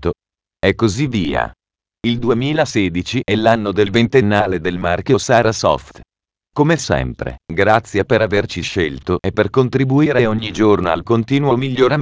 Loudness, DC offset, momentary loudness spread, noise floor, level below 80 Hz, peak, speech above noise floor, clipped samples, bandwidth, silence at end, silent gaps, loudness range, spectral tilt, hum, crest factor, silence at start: -16 LUFS; under 0.1%; 7 LU; -89 dBFS; -38 dBFS; 0 dBFS; 73 dB; under 0.1%; 8 kHz; 0 s; none; 2 LU; -6 dB/octave; none; 16 dB; 0 s